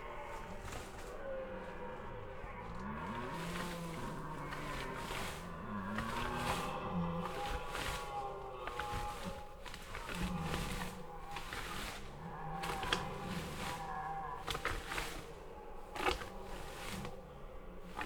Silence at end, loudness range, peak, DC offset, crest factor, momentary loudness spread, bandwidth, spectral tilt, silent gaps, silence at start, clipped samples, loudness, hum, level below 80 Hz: 0 s; 4 LU; -14 dBFS; under 0.1%; 28 dB; 10 LU; over 20 kHz; -4.5 dB/octave; none; 0 s; under 0.1%; -43 LUFS; none; -50 dBFS